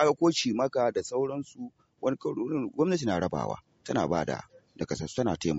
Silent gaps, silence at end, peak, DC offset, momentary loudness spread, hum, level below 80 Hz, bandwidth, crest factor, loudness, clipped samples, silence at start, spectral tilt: none; 0 s; -10 dBFS; under 0.1%; 13 LU; none; -60 dBFS; 8 kHz; 18 dB; -30 LUFS; under 0.1%; 0 s; -5 dB/octave